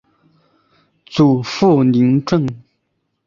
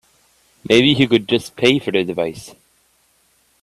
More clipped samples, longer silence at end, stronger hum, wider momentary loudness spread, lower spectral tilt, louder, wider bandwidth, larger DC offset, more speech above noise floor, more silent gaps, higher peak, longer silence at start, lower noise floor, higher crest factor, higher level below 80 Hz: neither; second, 0.7 s vs 1.1 s; neither; second, 8 LU vs 11 LU; first, -7.5 dB/octave vs -5 dB/octave; about the same, -15 LUFS vs -16 LUFS; second, 7.4 kHz vs 13.5 kHz; neither; first, 57 dB vs 43 dB; neither; about the same, -2 dBFS vs 0 dBFS; first, 1.1 s vs 0.7 s; first, -70 dBFS vs -60 dBFS; about the same, 16 dB vs 18 dB; about the same, -52 dBFS vs -54 dBFS